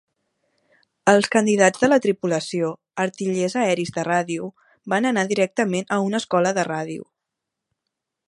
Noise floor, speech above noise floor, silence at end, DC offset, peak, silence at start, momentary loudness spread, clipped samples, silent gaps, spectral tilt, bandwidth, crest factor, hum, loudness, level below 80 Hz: -83 dBFS; 62 dB; 1.25 s; under 0.1%; 0 dBFS; 1.05 s; 10 LU; under 0.1%; none; -4.5 dB/octave; 11.5 kHz; 22 dB; none; -21 LUFS; -66 dBFS